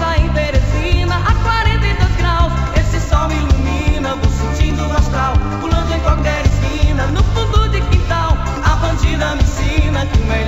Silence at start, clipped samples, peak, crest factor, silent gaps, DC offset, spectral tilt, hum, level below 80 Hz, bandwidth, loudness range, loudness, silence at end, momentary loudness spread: 0 s; under 0.1%; 0 dBFS; 14 dB; none; 2%; -6 dB/octave; none; -16 dBFS; 8 kHz; 1 LU; -16 LUFS; 0 s; 2 LU